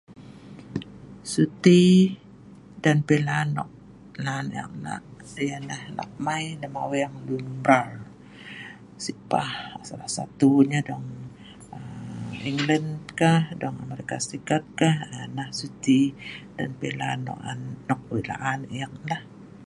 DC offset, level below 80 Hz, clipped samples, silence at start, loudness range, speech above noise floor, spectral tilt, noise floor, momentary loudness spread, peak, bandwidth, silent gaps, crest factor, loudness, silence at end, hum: under 0.1%; -60 dBFS; under 0.1%; 0.1 s; 9 LU; 23 dB; -6 dB/octave; -47 dBFS; 19 LU; -2 dBFS; 11.5 kHz; none; 24 dB; -25 LUFS; 0.05 s; none